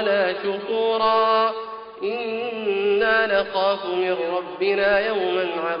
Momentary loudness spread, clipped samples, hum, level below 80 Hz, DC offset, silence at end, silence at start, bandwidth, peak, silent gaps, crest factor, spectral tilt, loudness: 8 LU; under 0.1%; none; -58 dBFS; under 0.1%; 0 s; 0 s; 5.4 kHz; -6 dBFS; none; 16 dB; -1 dB/octave; -22 LUFS